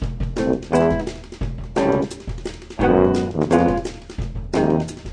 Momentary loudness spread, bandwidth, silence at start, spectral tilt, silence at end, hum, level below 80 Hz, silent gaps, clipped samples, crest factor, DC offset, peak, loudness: 14 LU; 10 kHz; 0 s; -7 dB/octave; 0 s; none; -32 dBFS; none; under 0.1%; 20 dB; under 0.1%; -2 dBFS; -21 LUFS